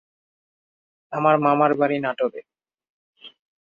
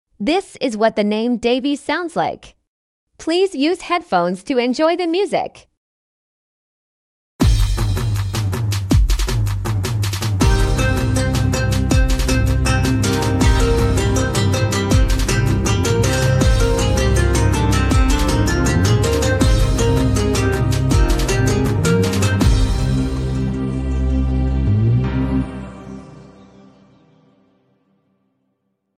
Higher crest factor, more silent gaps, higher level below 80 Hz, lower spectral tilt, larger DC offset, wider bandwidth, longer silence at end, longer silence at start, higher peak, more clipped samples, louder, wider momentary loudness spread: first, 20 dB vs 14 dB; second, 2.89-3.13 s vs 2.67-3.07 s, 5.77-7.39 s; second, -72 dBFS vs -22 dBFS; first, -8.5 dB/octave vs -5.5 dB/octave; neither; second, 7 kHz vs 15 kHz; second, 0.4 s vs 2.75 s; first, 1.1 s vs 0.2 s; about the same, -4 dBFS vs -2 dBFS; neither; second, -20 LUFS vs -17 LUFS; first, 12 LU vs 5 LU